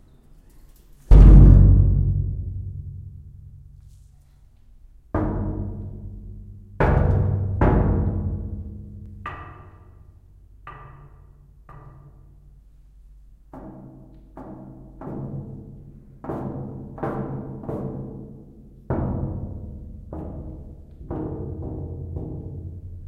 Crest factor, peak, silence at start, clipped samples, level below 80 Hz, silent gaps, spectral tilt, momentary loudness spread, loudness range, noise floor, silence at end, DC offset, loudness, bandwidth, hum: 22 dB; 0 dBFS; 1.1 s; under 0.1%; -24 dBFS; none; -10.5 dB/octave; 25 LU; 23 LU; -51 dBFS; 0 s; under 0.1%; -21 LUFS; 3.1 kHz; none